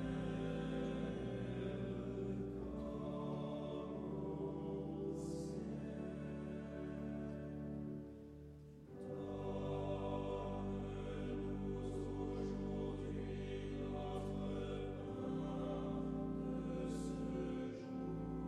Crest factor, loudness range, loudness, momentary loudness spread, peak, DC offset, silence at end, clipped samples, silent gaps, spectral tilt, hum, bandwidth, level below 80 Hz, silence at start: 12 dB; 3 LU; -45 LUFS; 5 LU; -30 dBFS; under 0.1%; 0 s; under 0.1%; none; -8 dB/octave; none; 11.5 kHz; -56 dBFS; 0 s